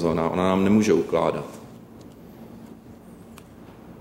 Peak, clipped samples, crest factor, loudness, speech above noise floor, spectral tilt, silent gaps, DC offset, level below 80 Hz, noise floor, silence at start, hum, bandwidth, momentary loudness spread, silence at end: -8 dBFS; under 0.1%; 18 dB; -22 LUFS; 24 dB; -6.5 dB/octave; none; under 0.1%; -52 dBFS; -45 dBFS; 0 s; none; 16 kHz; 26 LU; 0 s